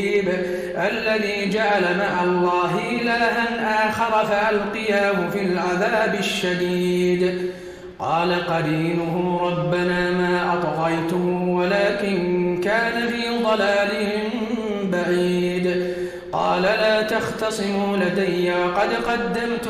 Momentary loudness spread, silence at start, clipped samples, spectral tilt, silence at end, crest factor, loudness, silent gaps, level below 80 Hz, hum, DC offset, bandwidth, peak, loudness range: 5 LU; 0 s; under 0.1%; -5.5 dB/octave; 0 s; 12 dB; -21 LUFS; none; -52 dBFS; none; under 0.1%; 15 kHz; -8 dBFS; 2 LU